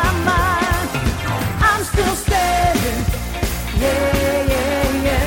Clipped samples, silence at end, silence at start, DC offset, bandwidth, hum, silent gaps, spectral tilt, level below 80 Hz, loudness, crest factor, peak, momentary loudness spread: under 0.1%; 0 s; 0 s; under 0.1%; 17 kHz; none; none; -4.5 dB/octave; -24 dBFS; -18 LUFS; 14 dB; -2 dBFS; 5 LU